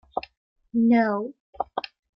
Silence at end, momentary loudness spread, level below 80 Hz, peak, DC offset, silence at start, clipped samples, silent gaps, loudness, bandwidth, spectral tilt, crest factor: 0.35 s; 15 LU; -64 dBFS; -10 dBFS; under 0.1%; 0.15 s; under 0.1%; 0.37-0.56 s, 1.40-1.53 s; -25 LUFS; 5.8 kHz; -8.5 dB/octave; 14 dB